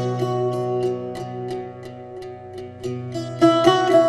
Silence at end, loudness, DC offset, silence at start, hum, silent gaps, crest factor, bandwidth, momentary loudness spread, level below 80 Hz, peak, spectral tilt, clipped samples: 0 s; -22 LUFS; under 0.1%; 0 s; none; none; 20 dB; 12.5 kHz; 20 LU; -56 dBFS; -2 dBFS; -6.5 dB/octave; under 0.1%